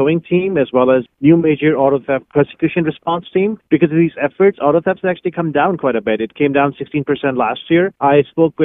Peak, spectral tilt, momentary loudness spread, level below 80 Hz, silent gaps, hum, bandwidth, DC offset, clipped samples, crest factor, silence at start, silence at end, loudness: 0 dBFS; -11 dB/octave; 6 LU; -52 dBFS; none; none; 3.9 kHz; under 0.1%; under 0.1%; 14 dB; 0 s; 0 s; -15 LUFS